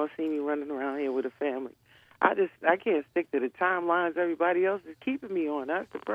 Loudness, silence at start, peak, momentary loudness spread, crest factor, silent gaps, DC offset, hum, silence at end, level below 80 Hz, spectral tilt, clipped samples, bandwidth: -29 LUFS; 0 s; -8 dBFS; 7 LU; 22 dB; none; under 0.1%; none; 0 s; -78 dBFS; -7 dB/octave; under 0.1%; 5.2 kHz